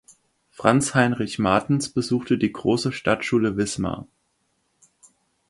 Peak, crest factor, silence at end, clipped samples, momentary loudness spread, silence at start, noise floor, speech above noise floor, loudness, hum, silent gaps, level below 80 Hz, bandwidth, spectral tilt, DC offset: -2 dBFS; 22 dB; 1.45 s; under 0.1%; 6 LU; 0.6 s; -70 dBFS; 49 dB; -22 LUFS; none; none; -52 dBFS; 11.5 kHz; -5.5 dB/octave; under 0.1%